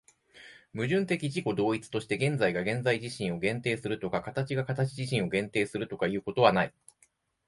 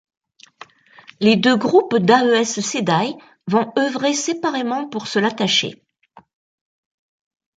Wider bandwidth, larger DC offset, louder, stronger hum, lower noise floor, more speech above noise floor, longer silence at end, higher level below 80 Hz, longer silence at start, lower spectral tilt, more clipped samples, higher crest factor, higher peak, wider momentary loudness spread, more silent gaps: first, 11.5 kHz vs 9.4 kHz; neither; second, -30 LUFS vs -18 LUFS; neither; first, -68 dBFS vs -51 dBFS; first, 39 dB vs 33 dB; second, 0.8 s vs 1.85 s; about the same, -62 dBFS vs -66 dBFS; second, 0.35 s vs 1.2 s; first, -6 dB/octave vs -4 dB/octave; neither; first, 24 dB vs 18 dB; second, -8 dBFS vs -2 dBFS; about the same, 8 LU vs 9 LU; neither